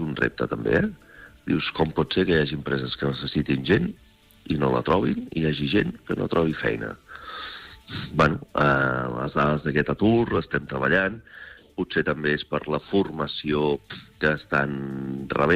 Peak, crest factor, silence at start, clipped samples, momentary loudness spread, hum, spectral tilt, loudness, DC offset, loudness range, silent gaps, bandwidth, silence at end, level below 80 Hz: -10 dBFS; 16 dB; 0 s; under 0.1%; 14 LU; none; -7.5 dB/octave; -24 LUFS; under 0.1%; 3 LU; none; 10.5 kHz; 0 s; -46 dBFS